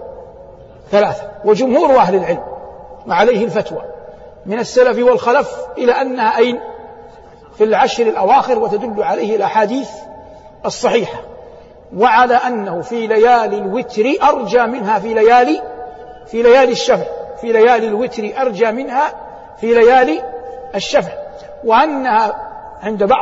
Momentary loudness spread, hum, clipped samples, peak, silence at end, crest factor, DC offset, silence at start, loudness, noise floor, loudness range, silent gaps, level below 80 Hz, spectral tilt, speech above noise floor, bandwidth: 19 LU; none; under 0.1%; 0 dBFS; 0 s; 14 dB; under 0.1%; 0 s; -14 LUFS; -39 dBFS; 3 LU; none; -48 dBFS; -5 dB/octave; 26 dB; 8 kHz